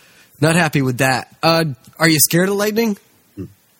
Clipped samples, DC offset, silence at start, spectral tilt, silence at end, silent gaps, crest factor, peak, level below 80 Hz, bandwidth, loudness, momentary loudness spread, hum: under 0.1%; under 0.1%; 0.4 s; -4 dB/octave; 0.35 s; none; 18 dB; 0 dBFS; -54 dBFS; 17 kHz; -16 LUFS; 17 LU; none